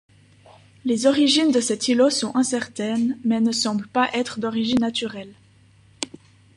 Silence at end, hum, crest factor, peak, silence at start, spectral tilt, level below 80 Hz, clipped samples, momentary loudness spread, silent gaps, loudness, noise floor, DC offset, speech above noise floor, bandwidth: 0.5 s; none; 18 dB; -4 dBFS; 0.85 s; -3.5 dB/octave; -62 dBFS; under 0.1%; 14 LU; none; -21 LUFS; -54 dBFS; under 0.1%; 33 dB; 11.5 kHz